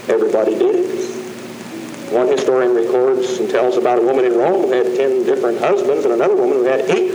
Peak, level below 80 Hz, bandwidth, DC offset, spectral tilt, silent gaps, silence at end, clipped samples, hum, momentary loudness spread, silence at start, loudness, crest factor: -2 dBFS; -70 dBFS; over 20 kHz; under 0.1%; -5 dB/octave; none; 0 s; under 0.1%; none; 12 LU; 0 s; -15 LUFS; 14 dB